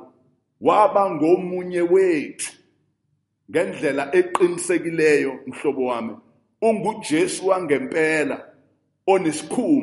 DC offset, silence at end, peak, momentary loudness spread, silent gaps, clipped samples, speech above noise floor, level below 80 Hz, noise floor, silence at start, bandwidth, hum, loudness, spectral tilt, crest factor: under 0.1%; 0 s; -2 dBFS; 9 LU; none; under 0.1%; 51 dB; -70 dBFS; -71 dBFS; 0 s; 11.5 kHz; none; -21 LUFS; -5 dB/octave; 18 dB